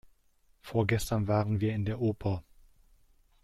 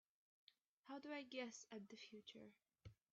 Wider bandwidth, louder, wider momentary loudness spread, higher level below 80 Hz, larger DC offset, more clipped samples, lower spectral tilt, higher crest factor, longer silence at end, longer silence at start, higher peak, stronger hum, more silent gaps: first, 14.5 kHz vs 7.6 kHz; first, -31 LUFS vs -56 LUFS; second, 6 LU vs 16 LU; first, -52 dBFS vs -86 dBFS; neither; neither; first, -7 dB/octave vs -3 dB/octave; about the same, 22 dB vs 20 dB; first, 1.05 s vs 0.2 s; first, 0.65 s vs 0.5 s; first, -10 dBFS vs -38 dBFS; neither; second, none vs 0.61-0.83 s